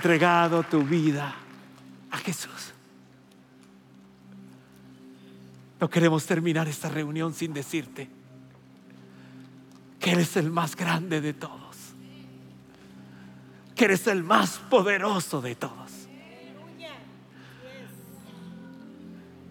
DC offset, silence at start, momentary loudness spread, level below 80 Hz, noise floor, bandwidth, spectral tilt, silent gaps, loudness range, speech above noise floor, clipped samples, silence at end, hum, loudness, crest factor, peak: under 0.1%; 0 s; 25 LU; -74 dBFS; -54 dBFS; 17 kHz; -5 dB/octave; none; 15 LU; 29 dB; under 0.1%; 0.1 s; none; -26 LUFS; 26 dB; -4 dBFS